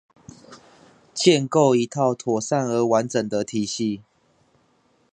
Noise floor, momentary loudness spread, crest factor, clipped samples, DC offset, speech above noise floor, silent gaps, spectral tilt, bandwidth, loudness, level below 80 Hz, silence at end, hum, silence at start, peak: -63 dBFS; 8 LU; 20 dB; under 0.1%; under 0.1%; 42 dB; none; -5 dB/octave; 10 kHz; -21 LUFS; -66 dBFS; 1.15 s; none; 0.5 s; -2 dBFS